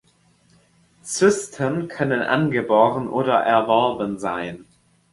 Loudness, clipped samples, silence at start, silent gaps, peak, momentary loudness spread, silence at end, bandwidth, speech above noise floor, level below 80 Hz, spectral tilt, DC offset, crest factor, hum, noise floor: -20 LUFS; under 0.1%; 1.05 s; none; -2 dBFS; 11 LU; 0.5 s; 11.5 kHz; 39 dB; -58 dBFS; -5 dB/octave; under 0.1%; 18 dB; none; -59 dBFS